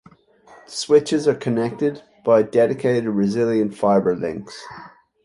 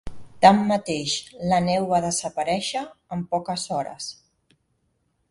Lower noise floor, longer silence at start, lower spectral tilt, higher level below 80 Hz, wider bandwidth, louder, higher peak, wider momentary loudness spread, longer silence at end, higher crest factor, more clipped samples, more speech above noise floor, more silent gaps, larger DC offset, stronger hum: second, -50 dBFS vs -70 dBFS; first, 0.7 s vs 0.05 s; first, -6 dB/octave vs -4.5 dB/octave; second, -60 dBFS vs -52 dBFS; about the same, 11.5 kHz vs 11.5 kHz; first, -20 LUFS vs -23 LUFS; second, -4 dBFS vs 0 dBFS; about the same, 16 LU vs 16 LU; second, 0.35 s vs 1.2 s; second, 16 dB vs 24 dB; neither; second, 31 dB vs 48 dB; neither; neither; neither